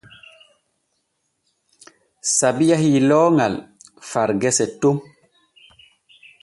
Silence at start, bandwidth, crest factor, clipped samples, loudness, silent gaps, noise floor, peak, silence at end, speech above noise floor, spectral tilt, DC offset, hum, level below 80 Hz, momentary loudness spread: 2.25 s; 11.5 kHz; 18 dB; under 0.1%; -18 LUFS; none; -72 dBFS; -4 dBFS; 1.4 s; 55 dB; -4.5 dB/octave; under 0.1%; none; -60 dBFS; 12 LU